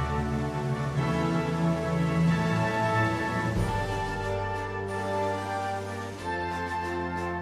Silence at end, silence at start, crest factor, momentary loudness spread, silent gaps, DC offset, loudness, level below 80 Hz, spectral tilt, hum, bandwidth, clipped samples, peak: 0 s; 0 s; 14 dB; 7 LU; none; under 0.1%; -29 LUFS; -44 dBFS; -6.5 dB/octave; none; 13.5 kHz; under 0.1%; -14 dBFS